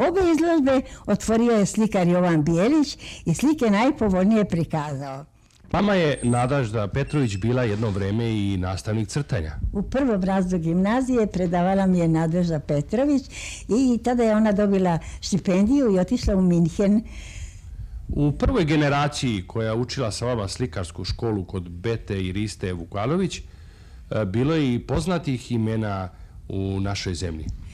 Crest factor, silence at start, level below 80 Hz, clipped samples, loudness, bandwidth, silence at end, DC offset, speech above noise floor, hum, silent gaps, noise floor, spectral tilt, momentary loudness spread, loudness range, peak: 12 dB; 0 s; -38 dBFS; under 0.1%; -23 LUFS; 13 kHz; 0 s; under 0.1%; 21 dB; none; none; -43 dBFS; -6.5 dB/octave; 11 LU; 6 LU; -10 dBFS